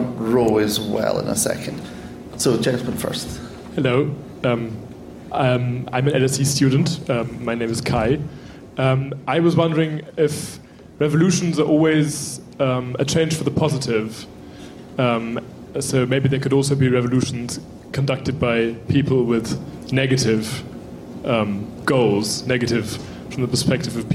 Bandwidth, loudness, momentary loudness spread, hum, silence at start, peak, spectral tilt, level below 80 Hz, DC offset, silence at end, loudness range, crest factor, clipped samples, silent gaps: 16 kHz; -20 LUFS; 14 LU; none; 0 s; -6 dBFS; -5.5 dB/octave; -48 dBFS; under 0.1%; 0 s; 3 LU; 14 dB; under 0.1%; none